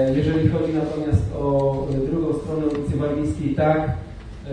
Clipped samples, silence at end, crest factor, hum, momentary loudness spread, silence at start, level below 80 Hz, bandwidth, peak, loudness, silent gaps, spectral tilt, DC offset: under 0.1%; 0 s; 16 dB; none; 4 LU; 0 s; -36 dBFS; 10 kHz; -6 dBFS; -22 LUFS; none; -9 dB/octave; under 0.1%